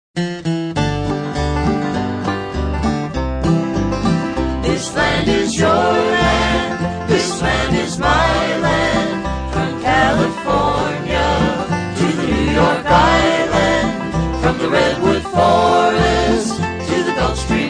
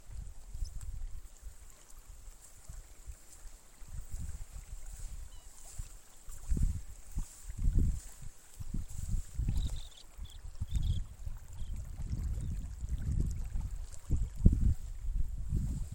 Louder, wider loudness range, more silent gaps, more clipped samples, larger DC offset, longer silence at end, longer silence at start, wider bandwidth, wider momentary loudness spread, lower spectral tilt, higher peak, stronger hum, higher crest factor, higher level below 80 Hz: first, -16 LUFS vs -40 LUFS; second, 4 LU vs 14 LU; neither; neither; neither; about the same, 0 s vs 0 s; first, 0.15 s vs 0 s; second, 10 kHz vs 17 kHz; second, 7 LU vs 19 LU; about the same, -5.5 dB/octave vs -6.5 dB/octave; first, -2 dBFS vs -8 dBFS; neither; second, 14 dB vs 28 dB; first, -28 dBFS vs -38 dBFS